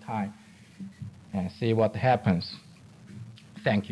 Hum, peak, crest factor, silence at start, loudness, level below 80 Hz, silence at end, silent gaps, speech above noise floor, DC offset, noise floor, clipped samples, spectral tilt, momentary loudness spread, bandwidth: none; -10 dBFS; 20 dB; 0 s; -28 LUFS; -64 dBFS; 0 s; none; 22 dB; under 0.1%; -49 dBFS; under 0.1%; -7.5 dB/octave; 21 LU; 11 kHz